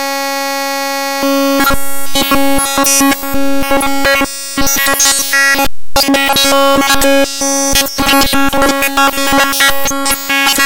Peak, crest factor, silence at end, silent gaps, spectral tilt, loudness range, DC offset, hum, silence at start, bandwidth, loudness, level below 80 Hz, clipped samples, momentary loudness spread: 0 dBFS; 10 dB; 0 s; none; -1.5 dB/octave; 2 LU; under 0.1%; none; 0 s; 17.5 kHz; -10 LUFS; -30 dBFS; under 0.1%; 7 LU